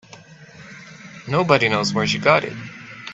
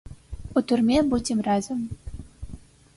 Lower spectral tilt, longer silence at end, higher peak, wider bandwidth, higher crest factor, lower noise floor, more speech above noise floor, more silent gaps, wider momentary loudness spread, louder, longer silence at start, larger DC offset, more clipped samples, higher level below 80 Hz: about the same, -5 dB/octave vs -5.5 dB/octave; second, 0 s vs 0.35 s; first, 0 dBFS vs -10 dBFS; second, 8.2 kHz vs 11.5 kHz; first, 22 dB vs 16 dB; about the same, -44 dBFS vs -43 dBFS; first, 25 dB vs 21 dB; neither; about the same, 23 LU vs 22 LU; first, -18 LUFS vs -24 LUFS; about the same, 0.1 s vs 0.05 s; neither; neither; second, -58 dBFS vs -42 dBFS